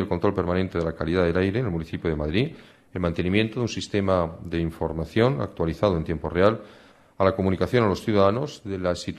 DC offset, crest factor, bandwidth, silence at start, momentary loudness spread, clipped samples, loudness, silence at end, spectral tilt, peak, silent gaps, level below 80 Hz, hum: under 0.1%; 18 dB; 13.5 kHz; 0 s; 7 LU; under 0.1%; -25 LUFS; 0 s; -7 dB/octave; -6 dBFS; none; -44 dBFS; none